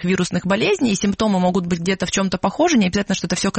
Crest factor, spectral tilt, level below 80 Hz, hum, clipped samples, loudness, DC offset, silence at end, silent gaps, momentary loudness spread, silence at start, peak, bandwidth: 14 dB; -4.5 dB/octave; -46 dBFS; none; under 0.1%; -19 LUFS; under 0.1%; 0 s; none; 4 LU; 0 s; -4 dBFS; 8.8 kHz